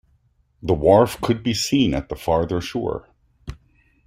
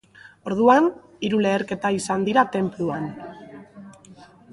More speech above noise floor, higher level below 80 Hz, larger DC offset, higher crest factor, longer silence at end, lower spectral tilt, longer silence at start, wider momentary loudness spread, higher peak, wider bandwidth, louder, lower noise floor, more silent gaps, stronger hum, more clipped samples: first, 42 dB vs 27 dB; first, -42 dBFS vs -62 dBFS; neither; about the same, 20 dB vs 20 dB; first, 0.55 s vs 0.3 s; about the same, -5.5 dB/octave vs -5.5 dB/octave; first, 0.65 s vs 0.45 s; about the same, 24 LU vs 22 LU; about the same, -2 dBFS vs -4 dBFS; first, 16 kHz vs 11.5 kHz; about the same, -20 LUFS vs -22 LUFS; first, -62 dBFS vs -48 dBFS; neither; neither; neither